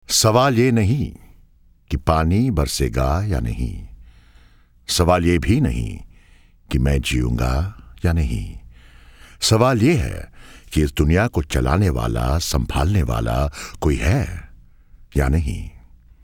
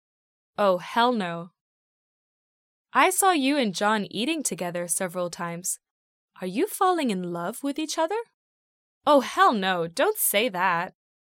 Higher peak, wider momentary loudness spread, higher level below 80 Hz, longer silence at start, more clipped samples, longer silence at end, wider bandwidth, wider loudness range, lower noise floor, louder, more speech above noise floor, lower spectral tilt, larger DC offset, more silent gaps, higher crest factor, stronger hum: first, -2 dBFS vs -6 dBFS; first, 14 LU vs 10 LU; first, -28 dBFS vs -76 dBFS; second, 0.1 s vs 0.6 s; neither; first, 0.45 s vs 0.3 s; first, 19.5 kHz vs 17 kHz; about the same, 3 LU vs 4 LU; second, -52 dBFS vs under -90 dBFS; first, -20 LUFS vs -24 LUFS; second, 33 dB vs over 66 dB; first, -5.5 dB/octave vs -3 dB/octave; neither; second, none vs 1.61-2.85 s, 5.90-6.28 s, 8.34-9.01 s; about the same, 18 dB vs 20 dB; neither